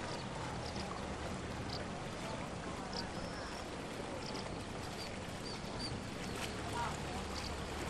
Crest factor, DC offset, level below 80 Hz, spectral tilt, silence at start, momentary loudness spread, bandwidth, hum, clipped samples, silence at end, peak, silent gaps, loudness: 16 dB; under 0.1%; -54 dBFS; -4.5 dB/octave; 0 s; 3 LU; 13 kHz; none; under 0.1%; 0 s; -28 dBFS; none; -43 LUFS